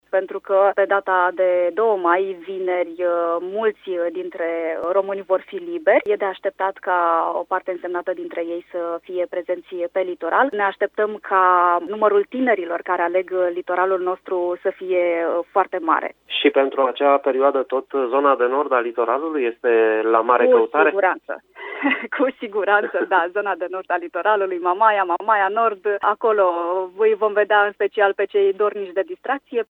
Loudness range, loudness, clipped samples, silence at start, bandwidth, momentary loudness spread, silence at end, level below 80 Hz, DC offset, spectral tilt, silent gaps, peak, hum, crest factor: 4 LU; -20 LUFS; under 0.1%; 0.15 s; 4.1 kHz; 9 LU; 0.15 s; -72 dBFS; under 0.1%; -6.5 dB/octave; none; -2 dBFS; none; 18 dB